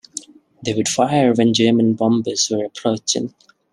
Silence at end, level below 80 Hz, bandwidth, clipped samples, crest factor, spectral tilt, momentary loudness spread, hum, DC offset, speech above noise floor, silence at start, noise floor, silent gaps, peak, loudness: 0.45 s; -60 dBFS; 12 kHz; under 0.1%; 16 dB; -4.5 dB/octave; 13 LU; none; under 0.1%; 19 dB; 0.15 s; -37 dBFS; none; -2 dBFS; -17 LUFS